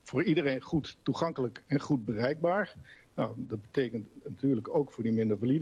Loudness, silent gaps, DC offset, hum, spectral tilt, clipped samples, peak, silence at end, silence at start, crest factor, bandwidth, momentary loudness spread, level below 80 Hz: -32 LUFS; none; under 0.1%; none; -7.5 dB/octave; under 0.1%; -16 dBFS; 0 s; 0.05 s; 14 dB; 9.6 kHz; 7 LU; -64 dBFS